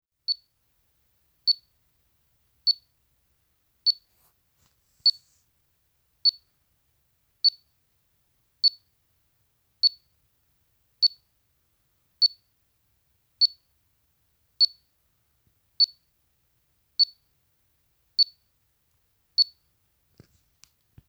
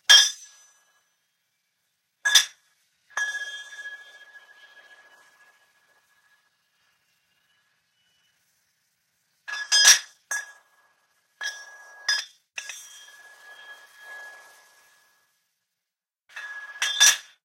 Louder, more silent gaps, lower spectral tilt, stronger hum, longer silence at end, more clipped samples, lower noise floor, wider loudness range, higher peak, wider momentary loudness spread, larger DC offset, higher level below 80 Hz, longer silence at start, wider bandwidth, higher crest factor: second, -24 LUFS vs -20 LUFS; neither; first, 1 dB/octave vs 6 dB/octave; neither; first, 1.65 s vs 0.25 s; neither; second, -71 dBFS vs -88 dBFS; second, 3 LU vs 22 LU; second, -12 dBFS vs -2 dBFS; second, 7 LU vs 30 LU; neither; first, -76 dBFS vs -88 dBFS; first, 0.3 s vs 0.1 s; first, over 20 kHz vs 16 kHz; second, 20 dB vs 26 dB